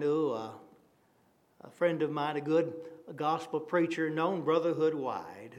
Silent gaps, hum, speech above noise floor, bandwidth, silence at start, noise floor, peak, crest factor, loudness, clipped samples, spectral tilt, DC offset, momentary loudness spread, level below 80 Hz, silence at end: none; none; 37 dB; 11.5 kHz; 0 s; -68 dBFS; -16 dBFS; 18 dB; -32 LUFS; under 0.1%; -7 dB/octave; under 0.1%; 10 LU; -86 dBFS; 0 s